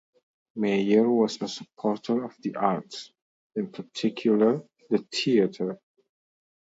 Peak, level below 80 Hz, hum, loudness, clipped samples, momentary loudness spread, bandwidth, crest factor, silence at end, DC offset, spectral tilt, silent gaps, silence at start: -6 dBFS; -74 dBFS; none; -26 LUFS; under 0.1%; 13 LU; 8 kHz; 20 dB; 1 s; under 0.1%; -6 dB/octave; 3.22-3.50 s; 0.55 s